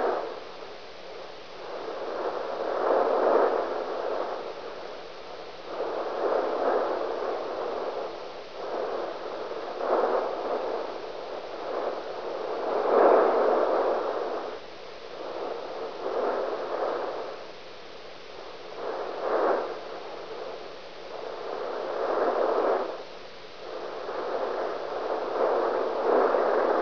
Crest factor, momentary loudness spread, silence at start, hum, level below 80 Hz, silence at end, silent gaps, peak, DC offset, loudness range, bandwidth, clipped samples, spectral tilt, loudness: 22 dB; 17 LU; 0 s; none; -68 dBFS; 0 s; none; -8 dBFS; 0.5%; 7 LU; 5.4 kHz; under 0.1%; -4.5 dB/octave; -29 LUFS